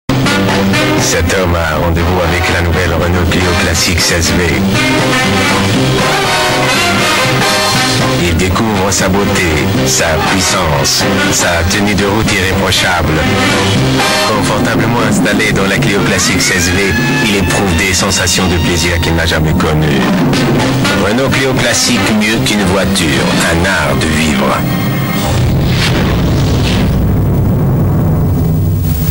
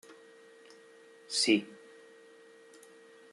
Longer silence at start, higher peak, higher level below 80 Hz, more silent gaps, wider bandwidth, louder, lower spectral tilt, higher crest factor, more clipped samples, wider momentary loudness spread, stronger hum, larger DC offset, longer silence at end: about the same, 0.1 s vs 0.1 s; first, 0 dBFS vs -12 dBFS; first, -24 dBFS vs -88 dBFS; neither; first, 16.5 kHz vs 12.5 kHz; first, -10 LUFS vs -29 LUFS; first, -4 dB/octave vs -2 dB/octave; second, 10 dB vs 24 dB; neither; second, 2 LU vs 28 LU; neither; neither; second, 0 s vs 1.6 s